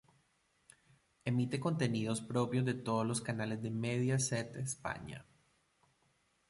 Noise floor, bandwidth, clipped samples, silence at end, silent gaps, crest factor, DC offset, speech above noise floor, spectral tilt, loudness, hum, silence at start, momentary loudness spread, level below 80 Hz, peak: -76 dBFS; 11.5 kHz; under 0.1%; 1.3 s; none; 18 dB; under 0.1%; 40 dB; -5.5 dB/octave; -36 LUFS; none; 1.25 s; 8 LU; -68 dBFS; -20 dBFS